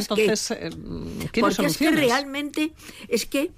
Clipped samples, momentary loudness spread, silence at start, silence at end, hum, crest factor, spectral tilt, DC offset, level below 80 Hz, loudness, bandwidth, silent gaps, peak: under 0.1%; 13 LU; 0 s; 0.05 s; none; 12 dB; -4 dB/octave; under 0.1%; -48 dBFS; -23 LUFS; 16 kHz; none; -12 dBFS